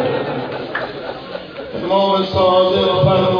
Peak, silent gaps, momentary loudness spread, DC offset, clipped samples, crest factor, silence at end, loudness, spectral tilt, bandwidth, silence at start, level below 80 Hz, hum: -2 dBFS; none; 15 LU; under 0.1%; under 0.1%; 14 dB; 0 s; -16 LUFS; -7.5 dB/octave; 5.4 kHz; 0 s; -46 dBFS; none